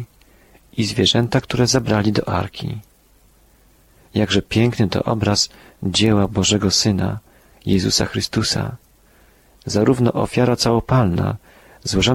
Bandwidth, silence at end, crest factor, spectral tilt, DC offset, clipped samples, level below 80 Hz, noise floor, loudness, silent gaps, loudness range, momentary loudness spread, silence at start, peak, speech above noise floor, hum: 16 kHz; 0 s; 16 dB; -4.5 dB/octave; under 0.1%; under 0.1%; -42 dBFS; -53 dBFS; -18 LUFS; none; 3 LU; 13 LU; 0 s; -2 dBFS; 36 dB; none